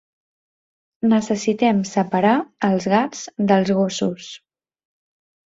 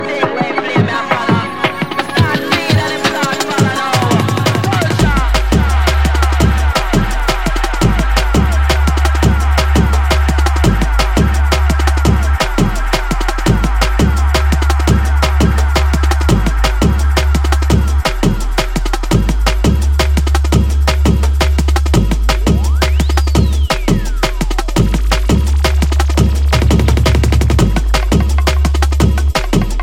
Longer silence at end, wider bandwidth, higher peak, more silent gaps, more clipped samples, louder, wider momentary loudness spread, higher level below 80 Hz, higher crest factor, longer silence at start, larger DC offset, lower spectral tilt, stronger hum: first, 1.1 s vs 0 s; second, 7.8 kHz vs 16 kHz; about the same, -2 dBFS vs 0 dBFS; neither; neither; second, -19 LUFS vs -13 LUFS; first, 8 LU vs 3 LU; second, -62 dBFS vs -14 dBFS; first, 18 dB vs 12 dB; first, 1.05 s vs 0 s; second, under 0.1% vs 1%; about the same, -5.5 dB/octave vs -5.5 dB/octave; neither